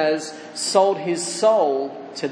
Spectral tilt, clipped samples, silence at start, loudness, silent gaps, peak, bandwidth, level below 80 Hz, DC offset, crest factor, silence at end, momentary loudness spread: -3 dB/octave; under 0.1%; 0 s; -21 LUFS; none; -4 dBFS; 10.5 kHz; -84 dBFS; under 0.1%; 18 dB; 0 s; 12 LU